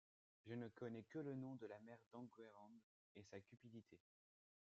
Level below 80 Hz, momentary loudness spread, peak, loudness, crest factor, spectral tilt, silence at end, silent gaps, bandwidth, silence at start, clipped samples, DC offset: under -90 dBFS; 15 LU; -40 dBFS; -57 LUFS; 18 dB; -7 dB/octave; 0.8 s; 2.06-2.11 s, 2.83-3.15 s; 7.6 kHz; 0.45 s; under 0.1%; under 0.1%